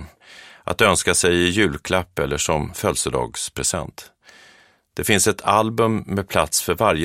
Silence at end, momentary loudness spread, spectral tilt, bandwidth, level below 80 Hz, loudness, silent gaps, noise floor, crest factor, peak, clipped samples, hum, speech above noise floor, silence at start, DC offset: 0 s; 10 LU; -3.5 dB/octave; 16.5 kHz; -42 dBFS; -20 LUFS; none; -53 dBFS; 20 dB; 0 dBFS; under 0.1%; none; 33 dB; 0 s; under 0.1%